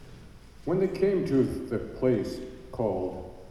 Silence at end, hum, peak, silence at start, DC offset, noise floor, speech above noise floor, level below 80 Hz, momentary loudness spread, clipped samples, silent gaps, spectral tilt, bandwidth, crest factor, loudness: 0 s; none; -12 dBFS; 0 s; under 0.1%; -48 dBFS; 21 dB; -50 dBFS; 14 LU; under 0.1%; none; -8 dB/octave; 13 kHz; 16 dB; -28 LUFS